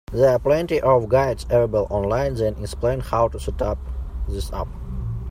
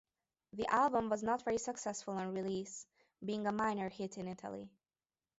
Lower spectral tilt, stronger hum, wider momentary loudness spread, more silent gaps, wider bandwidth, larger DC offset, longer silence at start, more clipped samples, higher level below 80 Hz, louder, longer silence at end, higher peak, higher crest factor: first, -7 dB/octave vs -4.5 dB/octave; neither; second, 12 LU vs 15 LU; neither; first, 16 kHz vs 8 kHz; neither; second, 0.1 s vs 0.55 s; neither; first, -32 dBFS vs -72 dBFS; first, -22 LUFS vs -38 LUFS; second, 0 s vs 0.7 s; first, -4 dBFS vs -18 dBFS; second, 16 dB vs 22 dB